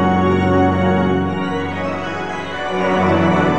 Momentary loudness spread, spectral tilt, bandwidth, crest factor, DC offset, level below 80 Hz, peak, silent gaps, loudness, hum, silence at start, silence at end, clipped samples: 9 LU; -7.5 dB/octave; 8.4 kHz; 12 dB; 1%; -44 dBFS; -4 dBFS; none; -17 LUFS; none; 0 s; 0 s; under 0.1%